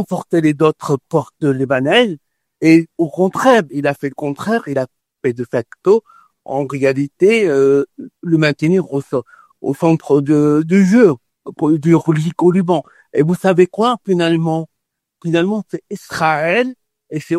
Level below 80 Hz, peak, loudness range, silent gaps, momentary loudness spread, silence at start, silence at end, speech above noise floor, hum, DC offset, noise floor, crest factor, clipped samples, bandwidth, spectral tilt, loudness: -60 dBFS; 0 dBFS; 4 LU; none; 11 LU; 0 s; 0 s; 48 dB; none; under 0.1%; -63 dBFS; 16 dB; under 0.1%; 13.5 kHz; -7 dB/octave; -15 LUFS